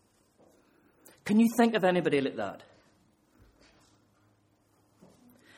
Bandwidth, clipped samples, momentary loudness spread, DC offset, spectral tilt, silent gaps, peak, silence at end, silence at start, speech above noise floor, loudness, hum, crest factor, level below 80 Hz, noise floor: 15.5 kHz; under 0.1%; 16 LU; under 0.1%; -6 dB/octave; none; -12 dBFS; 3 s; 1.25 s; 42 dB; -27 LUFS; none; 20 dB; -72 dBFS; -68 dBFS